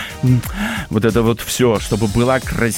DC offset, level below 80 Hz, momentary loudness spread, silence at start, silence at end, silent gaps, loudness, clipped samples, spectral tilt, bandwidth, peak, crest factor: under 0.1%; -32 dBFS; 4 LU; 0 s; 0 s; none; -17 LUFS; under 0.1%; -5.5 dB/octave; 17 kHz; -2 dBFS; 14 dB